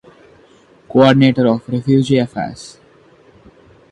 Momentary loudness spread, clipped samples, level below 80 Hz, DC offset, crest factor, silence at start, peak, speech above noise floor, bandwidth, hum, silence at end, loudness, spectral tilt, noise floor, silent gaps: 16 LU; under 0.1%; -52 dBFS; under 0.1%; 16 dB; 0.95 s; 0 dBFS; 35 dB; 10.5 kHz; none; 1.2 s; -14 LUFS; -7 dB/octave; -48 dBFS; none